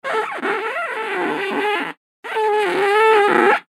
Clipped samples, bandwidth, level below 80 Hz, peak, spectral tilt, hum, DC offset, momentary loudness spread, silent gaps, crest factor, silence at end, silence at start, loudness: under 0.1%; 14 kHz; -90 dBFS; 0 dBFS; -3.5 dB/octave; none; under 0.1%; 10 LU; 1.97-2.23 s; 18 dB; 0.15 s; 0.05 s; -18 LUFS